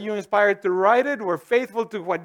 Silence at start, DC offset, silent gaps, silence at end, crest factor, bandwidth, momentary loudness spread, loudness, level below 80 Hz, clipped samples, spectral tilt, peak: 0 s; under 0.1%; none; 0 s; 16 dB; 15.5 kHz; 8 LU; -21 LUFS; -74 dBFS; under 0.1%; -5.5 dB/octave; -4 dBFS